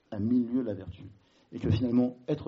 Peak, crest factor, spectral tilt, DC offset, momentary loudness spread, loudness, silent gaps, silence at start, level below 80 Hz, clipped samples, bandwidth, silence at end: -14 dBFS; 16 dB; -8.5 dB/octave; under 0.1%; 19 LU; -30 LUFS; none; 0.1 s; -54 dBFS; under 0.1%; 6 kHz; 0 s